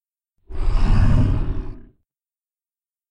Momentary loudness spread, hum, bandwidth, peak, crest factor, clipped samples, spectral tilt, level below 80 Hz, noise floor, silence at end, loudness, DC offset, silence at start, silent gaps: 18 LU; none; 5.8 kHz; -6 dBFS; 14 dB; under 0.1%; -8.5 dB/octave; -22 dBFS; under -90 dBFS; 1.25 s; -22 LUFS; under 0.1%; 0.5 s; none